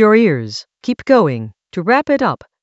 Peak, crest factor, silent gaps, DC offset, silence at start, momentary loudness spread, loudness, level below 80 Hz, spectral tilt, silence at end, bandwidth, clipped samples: 0 dBFS; 14 dB; none; under 0.1%; 0 s; 13 LU; -15 LUFS; -58 dBFS; -7 dB/octave; 0.25 s; 8 kHz; under 0.1%